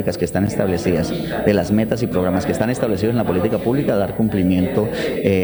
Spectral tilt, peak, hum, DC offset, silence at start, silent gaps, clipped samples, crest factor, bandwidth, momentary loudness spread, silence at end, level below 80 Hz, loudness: -7 dB/octave; 0 dBFS; none; under 0.1%; 0 s; none; under 0.1%; 18 dB; over 20 kHz; 3 LU; 0 s; -42 dBFS; -19 LUFS